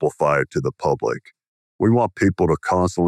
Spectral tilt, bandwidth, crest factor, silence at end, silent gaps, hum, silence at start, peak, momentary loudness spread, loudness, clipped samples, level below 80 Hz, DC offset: -7 dB/octave; 12.5 kHz; 14 dB; 0 s; 1.48-1.79 s; none; 0 s; -6 dBFS; 6 LU; -20 LUFS; under 0.1%; -50 dBFS; under 0.1%